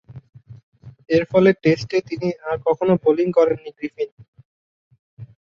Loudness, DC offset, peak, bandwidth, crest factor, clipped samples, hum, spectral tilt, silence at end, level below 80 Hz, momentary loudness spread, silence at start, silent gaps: -19 LUFS; under 0.1%; -2 dBFS; 7.2 kHz; 18 dB; under 0.1%; none; -7.5 dB/octave; 0.35 s; -58 dBFS; 12 LU; 0.1 s; 0.63-0.72 s, 4.12-4.17 s, 4.28-4.33 s, 4.45-4.91 s, 4.99-5.17 s